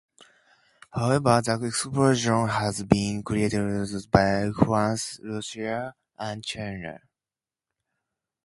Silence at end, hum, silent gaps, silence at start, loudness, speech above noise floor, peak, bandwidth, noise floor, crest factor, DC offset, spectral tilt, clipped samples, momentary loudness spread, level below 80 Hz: 1.5 s; none; none; 0.95 s; -25 LUFS; over 65 dB; 0 dBFS; 11.5 kHz; under -90 dBFS; 26 dB; under 0.1%; -5.5 dB/octave; under 0.1%; 13 LU; -48 dBFS